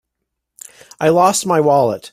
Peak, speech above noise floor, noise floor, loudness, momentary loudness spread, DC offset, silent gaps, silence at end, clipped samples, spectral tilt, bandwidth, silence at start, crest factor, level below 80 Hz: -2 dBFS; 63 dB; -77 dBFS; -14 LUFS; 3 LU; under 0.1%; none; 0.05 s; under 0.1%; -4.5 dB/octave; 16 kHz; 1 s; 14 dB; -58 dBFS